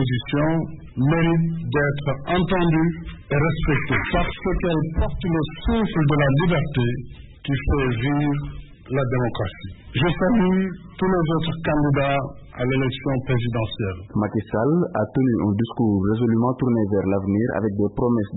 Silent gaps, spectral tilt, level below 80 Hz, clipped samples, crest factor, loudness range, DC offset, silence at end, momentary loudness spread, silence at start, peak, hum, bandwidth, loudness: none; -12 dB/octave; -36 dBFS; under 0.1%; 12 dB; 2 LU; under 0.1%; 0 s; 7 LU; 0 s; -8 dBFS; none; 4.1 kHz; -22 LUFS